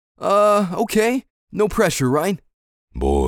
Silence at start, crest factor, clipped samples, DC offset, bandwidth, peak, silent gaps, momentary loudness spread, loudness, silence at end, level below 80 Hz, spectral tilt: 0.2 s; 16 dB; under 0.1%; under 0.1%; 19 kHz; -4 dBFS; 1.30-1.47 s, 2.54-2.88 s; 13 LU; -19 LUFS; 0 s; -34 dBFS; -5.5 dB/octave